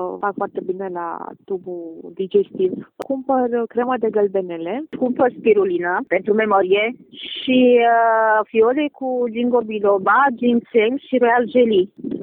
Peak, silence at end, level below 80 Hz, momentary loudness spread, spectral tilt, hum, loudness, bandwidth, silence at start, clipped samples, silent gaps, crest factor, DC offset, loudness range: -4 dBFS; 0 s; -64 dBFS; 13 LU; -8 dB/octave; none; -18 LUFS; 4.1 kHz; 0 s; under 0.1%; none; 14 dB; under 0.1%; 6 LU